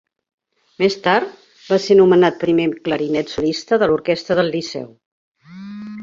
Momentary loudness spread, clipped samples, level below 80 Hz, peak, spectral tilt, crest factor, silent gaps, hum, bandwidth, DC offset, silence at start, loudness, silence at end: 19 LU; under 0.1%; -56 dBFS; -2 dBFS; -6 dB/octave; 16 dB; 5.06-5.35 s; none; 7.6 kHz; under 0.1%; 0.8 s; -17 LUFS; 0 s